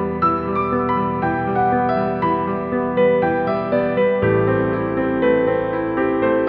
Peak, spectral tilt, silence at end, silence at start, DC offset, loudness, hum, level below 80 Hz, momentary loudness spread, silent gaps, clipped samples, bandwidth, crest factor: -4 dBFS; -10.5 dB/octave; 0 s; 0 s; under 0.1%; -19 LUFS; none; -44 dBFS; 4 LU; none; under 0.1%; 5 kHz; 14 dB